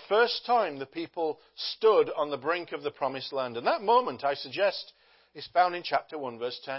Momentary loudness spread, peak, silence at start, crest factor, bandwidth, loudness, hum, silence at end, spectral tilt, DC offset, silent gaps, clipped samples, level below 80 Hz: 12 LU; -12 dBFS; 0 s; 18 dB; 5.8 kHz; -29 LUFS; none; 0 s; -7.5 dB/octave; under 0.1%; none; under 0.1%; -78 dBFS